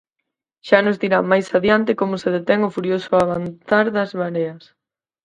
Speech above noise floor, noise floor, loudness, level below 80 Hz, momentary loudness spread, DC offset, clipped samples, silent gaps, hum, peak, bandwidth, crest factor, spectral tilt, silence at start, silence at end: 61 dB; -80 dBFS; -19 LUFS; -56 dBFS; 7 LU; under 0.1%; under 0.1%; none; none; 0 dBFS; 11 kHz; 18 dB; -6.5 dB/octave; 0.65 s; 0.65 s